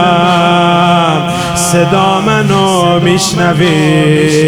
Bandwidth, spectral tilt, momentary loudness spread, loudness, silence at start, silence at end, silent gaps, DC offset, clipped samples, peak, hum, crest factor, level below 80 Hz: 16.5 kHz; -5 dB/octave; 2 LU; -9 LUFS; 0 s; 0 s; none; under 0.1%; 0.3%; 0 dBFS; none; 8 dB; -38 dBFS